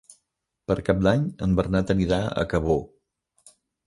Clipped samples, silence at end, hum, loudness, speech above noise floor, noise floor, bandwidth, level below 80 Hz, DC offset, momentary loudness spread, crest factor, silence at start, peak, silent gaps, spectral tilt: under 0.1%; 1 s; none; -24 LUFS; 55 dB; -78 dBFS; 11.5 kHz; -40 dBFS; under 0.1%; 6 LU; 18 dB; 0.7 s; -6 dBFS; none; -7.5 dB/octave